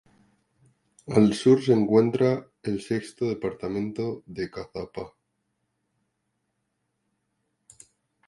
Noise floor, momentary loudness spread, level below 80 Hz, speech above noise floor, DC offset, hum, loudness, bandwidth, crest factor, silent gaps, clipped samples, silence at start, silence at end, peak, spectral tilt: -77 dBFS; 16 LU; -60 dBFS; 53 dB; under 0.1%; none; -25 LUFS; 11.5 kHz; 22 dB; none; under 0.1%; 1.05 s; 3.2 s; -4 dBFS; -7 dB/octave